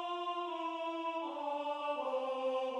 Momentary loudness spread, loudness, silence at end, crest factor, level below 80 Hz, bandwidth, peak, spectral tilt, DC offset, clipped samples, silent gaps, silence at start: 3 LU; -38 LUFS; 0 s; 12 dB; under -90 dBFS; 10.5 kHz; -26 dBFS; -2.5 dB/octave; under 0.1%; under 0.1%; none; 0 s